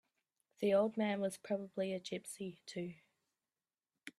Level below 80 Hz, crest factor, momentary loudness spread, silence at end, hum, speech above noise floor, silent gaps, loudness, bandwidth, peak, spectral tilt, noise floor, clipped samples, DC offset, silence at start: -84 dBFS; 18 dB; 14 LU; 0.1 s; none; over 52 dB; none; -39 LUFS; 14 kHz; -22 dBFS; -5.5 dB/octave; under -90 dBFS; under 0.1%; under 0.1%; 0.6 s